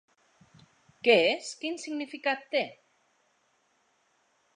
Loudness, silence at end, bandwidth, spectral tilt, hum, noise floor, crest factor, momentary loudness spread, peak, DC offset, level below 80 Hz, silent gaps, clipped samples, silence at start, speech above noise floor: -28 LUFS; 1.85 s; 10.5 kHz; -3 dB/octave; none; -71 dBFS; 24 dB; 13 LU; -8 dBFS; under 0.1%; -82 dBFS; none; under 0.1%; 1.05 s; 43 dB